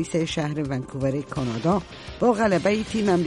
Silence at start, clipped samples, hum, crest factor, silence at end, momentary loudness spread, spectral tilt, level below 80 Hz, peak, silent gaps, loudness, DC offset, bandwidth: 0 s; under 0.1%; none; 16 dB; 0 s; 7 LU; -6 dB/octave; -48 dBFS; -8 dBFS; none; -24 LUFS; under 0.1%; 11.5 kHz